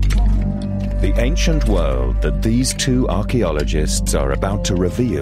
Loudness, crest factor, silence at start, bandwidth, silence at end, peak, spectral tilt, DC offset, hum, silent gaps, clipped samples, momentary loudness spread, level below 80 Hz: -19 LUFS; 12 dB; 0 s; 14 kHz; 0 s; -4 dBFS; -5.5 dB/octave; under 0.1%; none; none; under 0.1%; 3 LU; -20 dBFS